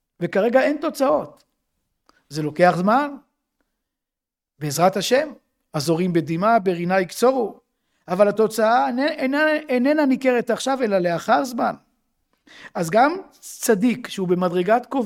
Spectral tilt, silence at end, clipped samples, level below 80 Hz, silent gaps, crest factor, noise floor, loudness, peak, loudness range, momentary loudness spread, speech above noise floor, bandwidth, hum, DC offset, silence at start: -5.5 dB/octave; 0 s; under 0.1%; -66 dBFS; none; 20 dB; -87 dBFS; -20 LUFS; -2 dBFS; 4 LU; 11 LU; 67 dB; 17 kHz; none; under 0.1%; 0.2 s